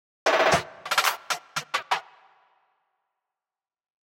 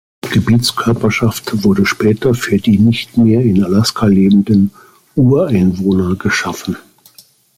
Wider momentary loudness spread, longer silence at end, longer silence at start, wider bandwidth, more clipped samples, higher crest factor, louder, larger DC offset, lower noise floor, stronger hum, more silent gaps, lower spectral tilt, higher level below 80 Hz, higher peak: first, 9 LU vs 6 LU; first, 2.15 s vs 0.8 s; about the same, 0.25 s vs 0.25 s; about the same, 16.5 kHz vs 16 kHz; neither; first, 20 dB vs 12 dB; second, -25 LUFS vs -13 LUFS; neither; first, under -90 dBFS vs -46 dBFS; neither; neither; second, -2 dB/octave vs -6 dB/octave; second, -62 dBFS vs -42 dBFS; second, -8 dBFS vs -2 dBFS